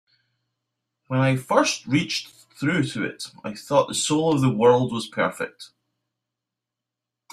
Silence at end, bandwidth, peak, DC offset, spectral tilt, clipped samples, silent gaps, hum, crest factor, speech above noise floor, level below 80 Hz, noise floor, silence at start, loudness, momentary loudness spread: 1.65 s; 15 kHz; -4 dBFS; under 0.1%; -5 dB/octave; under 0.1%; none; none; 22 dB; 64 dB; -62 dBFS; -86 dBFS; 1.1 s; -22 LUFS; 15 LU